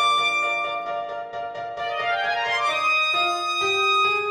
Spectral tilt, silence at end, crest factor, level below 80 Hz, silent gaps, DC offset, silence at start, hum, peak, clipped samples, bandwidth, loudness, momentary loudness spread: -1 dB/octave; 0 s; 12 dB; -66 dBFS; none; under 0.1%; 0 s; none; -10 dBFS; under 0.1%; 16 kHz; -22 LUFS; 12 LU